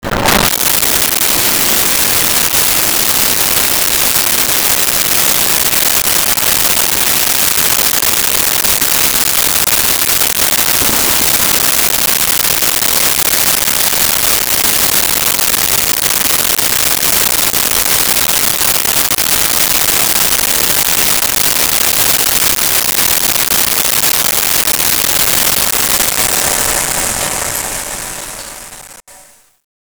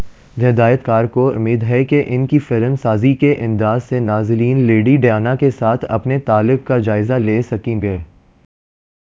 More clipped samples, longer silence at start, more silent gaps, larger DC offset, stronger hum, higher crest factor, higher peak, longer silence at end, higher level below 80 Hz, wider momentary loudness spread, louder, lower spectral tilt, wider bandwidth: neither; about the same, 0.05 s vs 0 s; neither; neither; neither; about the same, 12 dB vs 14 dB; about the same, 0 dBFS vs 0 dBFS; second, 0.75 s vs 1 s; first, -36 dBFS vs -42 dBFS; second, 2 LU vs 5 LU; first, -8 LUFS vs -15 LUFS; second, 0 dB/octave vs -9.5 dB/octave; first, over 20 kHz vs 7.4 kHz